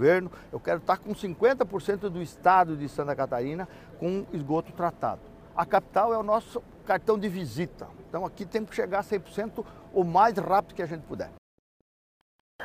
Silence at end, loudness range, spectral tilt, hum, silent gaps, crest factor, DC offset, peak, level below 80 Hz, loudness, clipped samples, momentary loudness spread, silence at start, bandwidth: 0 s; 4 LU; -7 dB/octave; none; 11.38-12.59 s; 22 dB; under 0.1%; -8 dBFS; -56 dBFS; -28 LUFS; under 0.1%; 15 LU; 0 s; 15 kHz